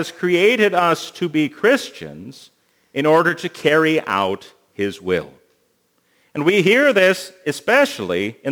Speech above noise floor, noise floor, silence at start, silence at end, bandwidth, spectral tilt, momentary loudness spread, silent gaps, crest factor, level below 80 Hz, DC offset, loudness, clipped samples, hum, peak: 46 dB; -64 dBFS; 0 s; 0 s; over 20 kHz; -5 dB/octave; 13 LU; none; 18 dB; -64 dBFS; under 0.1%; -17 LUFS; under 0.1%; none; 0 dBFS